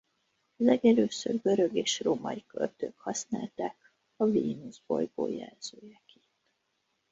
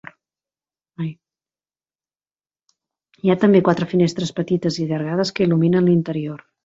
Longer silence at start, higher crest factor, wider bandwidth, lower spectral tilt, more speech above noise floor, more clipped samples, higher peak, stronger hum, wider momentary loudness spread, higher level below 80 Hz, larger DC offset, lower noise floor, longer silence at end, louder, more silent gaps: second, 0.6 s vs 1 s; about the same, 20 dB vs 20 dB; about the same, 7.8 kHz vs 7.8 kHz; second, -4.5 dB/octave vs -7 dB/octave; second, 49 dB vs over 72 dB; neither; second, -10 dBFS vs -2 dBFS; neither; about the same, 14 LU vs 15 LU; second, -72 dBFS vs -60 dBFS; neither; second, -78 dBFS vs under -90 dBFS; first, 1.2 s vs 0.3 s; second, -30 LUFS vs -19 LUFS; second, none vs 1.95-1.99 s